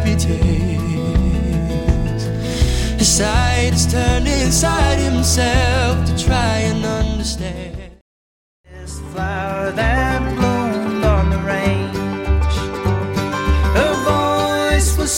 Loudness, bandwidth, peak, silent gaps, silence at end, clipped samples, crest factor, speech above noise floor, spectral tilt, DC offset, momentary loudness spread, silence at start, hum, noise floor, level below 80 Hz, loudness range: -17 LUFS; 17 kHz; -4 dBFS; 8.01-8.64 s; 0 s; under 0.1%; 14 dB; over 75 dB; -4.5 dB/octave; under 0.1%; 7 LU; 0 s; none; under -90 dBFS; -22 dBFS; 6 LU